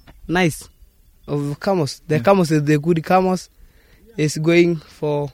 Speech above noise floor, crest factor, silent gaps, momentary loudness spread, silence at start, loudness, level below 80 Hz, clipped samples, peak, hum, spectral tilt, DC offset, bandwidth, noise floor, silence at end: 33 dB; 18 dB; none; 10 LU; 0.1 s; -19 LUFS; -48 dBFS; under 0.1%; 0 dBFS; none; -6.5 dB/octave; under 0.1%; 16 kHz; -50 dBFS; 0.05 s